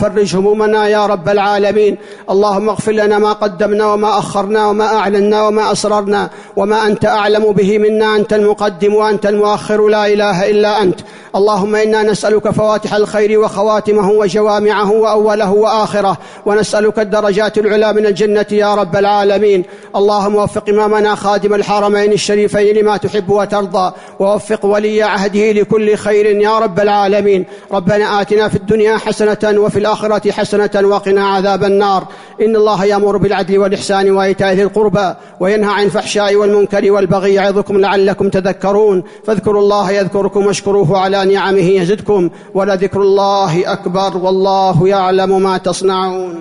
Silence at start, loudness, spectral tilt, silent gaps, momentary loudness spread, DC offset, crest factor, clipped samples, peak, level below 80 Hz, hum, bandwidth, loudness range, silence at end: 0 s; -12 LUFS; -5.5 dB/octave; none; 4 LU; under 0.1%; 8 dB; under 0.1%; -2 dBFS; -46 dBFS; none; 11 kHz; 1 LU; 0 s